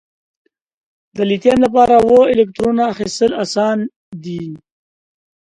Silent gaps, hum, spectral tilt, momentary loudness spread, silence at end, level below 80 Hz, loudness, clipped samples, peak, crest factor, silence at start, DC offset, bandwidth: 3.96-4.12 s; none; -5.5 dB/octave; 17 LU; 0.85 s; -48 dBFS; -14 LUFS; under 0.1%; 0 dBFS; 16 dB; 1.15 s; under 0.1%; 11 kHz